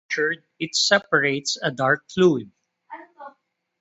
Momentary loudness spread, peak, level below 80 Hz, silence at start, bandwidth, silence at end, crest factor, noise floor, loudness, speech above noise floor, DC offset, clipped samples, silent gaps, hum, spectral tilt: 16 LU; -2 dBFS; -66 dBFS; 0.1 s; 8.2 kHz; 0.5 s; 22 dB; -64 dBFS; -21 LUFS; 43 dB; under 0.1%; under 0.1%; none; none; -3.5 dB/octave